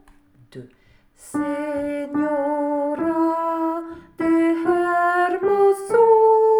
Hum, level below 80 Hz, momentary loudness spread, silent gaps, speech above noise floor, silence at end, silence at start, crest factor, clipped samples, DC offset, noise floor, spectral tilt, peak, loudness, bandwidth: none; -58 dBFS; 11 LU; none; 28 dB; 0 s; 0.55 s; 14 dB; under 0.1%; under 0.1%; -52 dBFS; -6 dB/octave; -6 dBFS; -20 LUFS; 16.5 kHz